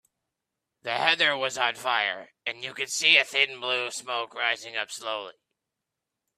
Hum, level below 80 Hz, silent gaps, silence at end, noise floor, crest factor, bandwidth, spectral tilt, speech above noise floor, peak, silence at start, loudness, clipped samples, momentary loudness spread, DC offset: none; -80 dBFS; none; 1.05 s; -86 dBFS; 24 dB; 15 kHz; 0 dB/octave; 58 dB; -4 dBFS; 0.85 s; -25 LUFS; under 0.1%; 15 LU; under 0.1%